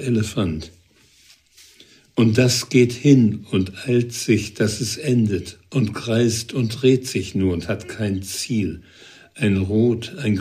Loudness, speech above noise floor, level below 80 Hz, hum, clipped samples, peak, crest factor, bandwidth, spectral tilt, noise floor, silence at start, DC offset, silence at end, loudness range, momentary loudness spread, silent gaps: -20 LUFS; 35 dB; -50 dBFS; none; under 0.1%; -2 dBFS; 18 dB; 15.5 kHz; -5.5 dB/octave; -54 dBFS; 0 s; under 0.1%; 0 s; 4 LU; 10 LU; none